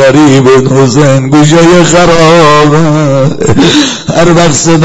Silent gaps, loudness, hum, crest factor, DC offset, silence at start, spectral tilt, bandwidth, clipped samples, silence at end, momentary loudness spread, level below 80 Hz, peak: none; -4 LUFS; none; 4 dB; under 0.1%; 0 s; -5 dB/octave; 11 kHz; 9%; 0 s; 5 LU; -30 dBFS; 0 dBFS